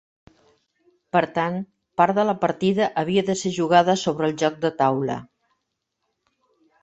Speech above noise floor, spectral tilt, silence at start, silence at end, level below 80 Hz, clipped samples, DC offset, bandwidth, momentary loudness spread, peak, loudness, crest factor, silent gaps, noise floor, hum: 57 dB; -5.5 dB/octave; 1.15 s; 1.6 s; -64 dBFS; under 0.1%; under 0.1%; 8.2 kHz; 9 LU; -2 dBFS; -22 LUFS; 20 dB; none; -78 dBFS; none